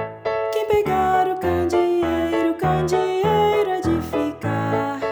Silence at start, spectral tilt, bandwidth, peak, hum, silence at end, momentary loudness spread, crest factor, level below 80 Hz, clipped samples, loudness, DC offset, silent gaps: 0 s; -6.5 dB/octave; over 20 kHz; -8 dBFS; none; 0 s; 6 LU; 12 dB; -46 dBFS; under 0.1%; -20 LUFS; under 0.1%; none